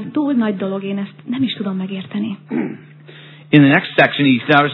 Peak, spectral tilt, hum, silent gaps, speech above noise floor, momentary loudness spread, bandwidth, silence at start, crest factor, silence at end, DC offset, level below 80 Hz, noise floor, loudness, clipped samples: 0 dBFS; -9 dB/octave; none; none; 24 dB; 13 LU; 5.4 kHz; 0 s; 16 dB; 0 s; under 0.1%; -68 dBFS; -40 dBFS; -17 LUFS; under 0.1%